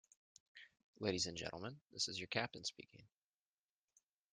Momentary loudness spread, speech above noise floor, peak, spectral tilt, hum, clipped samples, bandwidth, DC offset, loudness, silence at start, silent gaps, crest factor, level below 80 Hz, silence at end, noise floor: 22 LU; over 45 dB; -22 dBFS; -3 dB/octave; none; under 0.1%; 11.5 kHz; under 0.1%; -43 LUFS; 0.55 s; 0.83-0.93 s, 1.86-1.90 s; 26 dB; -78 dBFS; 1.25 s; under -90 dBFS